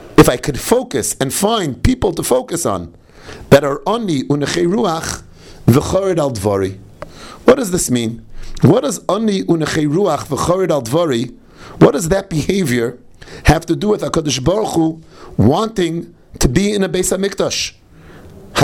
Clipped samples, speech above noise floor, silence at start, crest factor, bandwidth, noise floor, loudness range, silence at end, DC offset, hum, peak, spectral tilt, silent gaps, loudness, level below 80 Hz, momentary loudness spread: 0.2%; 24 dB; 0 s; 16 dB; 19.5 kHz; -39 dBFS; 2 LU; 0 s; under 0.1%; none; 0 dBFS; -5 dB/octave; none; -16 LUFS; -32 dBFS; 12 LU